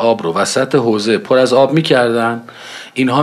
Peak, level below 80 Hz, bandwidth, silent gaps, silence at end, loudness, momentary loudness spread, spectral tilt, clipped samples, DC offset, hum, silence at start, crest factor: 0 dBFS; -62 dBFS; 13.5 kHz; none; 0 s; -13 LUFS; 14 LU; -5 dB/octave; under 0.1%; under 0.1%; none; 0 s; 14 dB